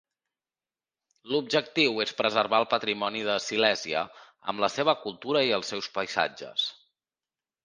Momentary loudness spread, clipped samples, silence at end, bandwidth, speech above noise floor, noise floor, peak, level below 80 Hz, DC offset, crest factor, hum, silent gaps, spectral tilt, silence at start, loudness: 7 LU; under 0.1%; 0.95 s; 10 kHz; over 63 dB; under -90 dBFS; -6 dBFS; -74 dBFS; under 0.1%; 24 dB; none; none; -3 dB/octave; 1.25 s; -27 LUFS